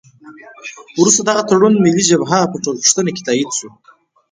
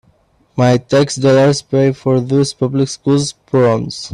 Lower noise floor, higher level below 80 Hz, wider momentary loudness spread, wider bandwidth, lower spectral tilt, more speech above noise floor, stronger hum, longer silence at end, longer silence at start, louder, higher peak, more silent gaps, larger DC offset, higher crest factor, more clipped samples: second, -39 dBFS vs -54 dBFS; second, -58 dBFS vs -50 dBFS; first, 14 LU vs 5 LU; second, 10 kHz vs 11.5 kHz; second, -3.5 dB/octave vs -6 dB/octave; second, 25 dB vs 41 dB; neither; first, 0.65 s vs 0 s; second, 0.25 s vs 0.55 s; about the same, -13 LUFS vs -14 LUFS; about the same, 0 dBFS vs 0 dBFS; neither; neither; about the same, 16 dB vs 14 dB; neither